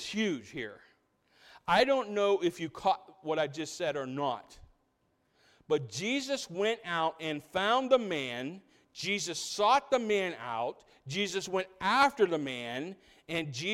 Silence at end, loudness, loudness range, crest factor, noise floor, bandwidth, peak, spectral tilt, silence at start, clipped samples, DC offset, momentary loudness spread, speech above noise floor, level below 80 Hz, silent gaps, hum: 0 s; -31 LUFS; 5 LU; 20 dB; -75 dBFS; 16 kHz; -12 dBFS; -3.5 dB/octave; 0 s; under 0.1%; under 0.1%; 13 LU; 43 dB; -68 dBFS; none; none